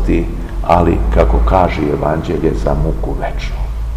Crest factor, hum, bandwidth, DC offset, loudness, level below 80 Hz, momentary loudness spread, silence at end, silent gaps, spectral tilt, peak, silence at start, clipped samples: 14 dB; none; 8.4 kHz; 0.4%; -15 LUFS; -18 dBFS; 10 LU; 0 s; none; -8 dB/octave; 0 dBFS; 0 s; 0.3%